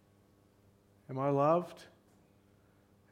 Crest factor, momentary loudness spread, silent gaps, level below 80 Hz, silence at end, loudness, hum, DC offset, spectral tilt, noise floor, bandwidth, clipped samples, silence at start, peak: 22 dB; 20 LU; none; -78 dBFS; 1.3 s; -32 LUFS; none; under 0.1%; -8.5 dB/octave; -66 dBFS; 14.5 kHz; under 0.1%; 1.1 s; -16 dBFS